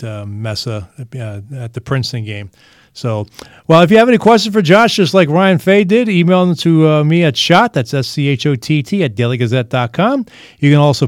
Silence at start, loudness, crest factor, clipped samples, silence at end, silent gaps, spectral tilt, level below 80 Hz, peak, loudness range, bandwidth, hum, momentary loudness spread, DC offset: 0 s; -12 LUFS; 12 dB; 0.2%; 0 s; none; -6.5 dB/octave; -54 dBFS; 0 dBFS; 9 LU; 15.5 kHz; none; 17 LU; under 0.1%